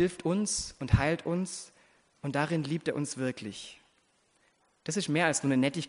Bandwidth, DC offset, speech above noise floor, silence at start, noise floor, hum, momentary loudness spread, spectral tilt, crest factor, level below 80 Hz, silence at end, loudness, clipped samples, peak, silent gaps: 10.5 kHz; under 0.1%; 40 dB; 0 s; -70 dBFS; none; 15 LU; -5 dB/octave; 22 dB; -48 dBFS; 0 s; -31 LUFS; under 0.1%; -10 dBFS; none